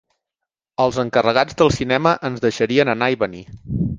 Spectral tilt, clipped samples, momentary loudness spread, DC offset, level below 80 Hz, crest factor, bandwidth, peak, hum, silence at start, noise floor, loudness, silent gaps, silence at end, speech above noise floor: -5.5 dB/octave; under 0.1%; 9 LU; under 0.1%; -42 dBFS; 18 dB; 9.6 kHz; 0 dBFS; none; 0.8 s; -84 dBFS; -18 LUFS; none; 0 s; 66 dB